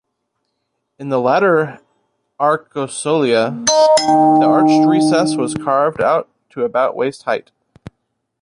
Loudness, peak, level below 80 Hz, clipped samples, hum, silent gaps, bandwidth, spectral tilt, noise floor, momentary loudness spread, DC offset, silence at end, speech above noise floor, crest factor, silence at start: -15 LUFS; 0 dBFS; -58 dBFS; under 0.1%; none; none; 11 kHz; -4.5 dB/octave; -72 dBFS; 11 LU; under 0.1%; 1 s; 58 dB; 16 dB; 1 s